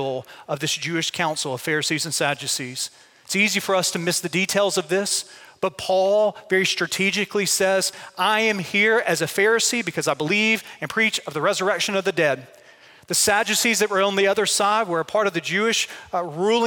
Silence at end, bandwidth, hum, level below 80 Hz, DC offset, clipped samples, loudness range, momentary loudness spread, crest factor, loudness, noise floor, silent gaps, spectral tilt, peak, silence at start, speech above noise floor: 0 s; 17 kHz; none; -66 dBFS; under 0.1%; under 0.1%; 3 LU; 8 LU; 18 dB; -21 LUFS; -50 dBFS; none; -2.5 dB/octave; -4 dBFS; 0 s; 28 dB